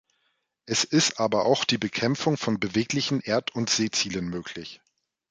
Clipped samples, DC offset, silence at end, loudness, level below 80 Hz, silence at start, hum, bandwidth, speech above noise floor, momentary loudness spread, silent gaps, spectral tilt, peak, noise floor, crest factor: under 0.1%; under 0.1%; 0.55 s; -25 LUFS; -60 dBFS; 0.65 s; none; 9.6 kHz; 48 dB; 10 LU; none; -3.5 dB/octave; -8 dBFS; -74 dBFS; 20 dB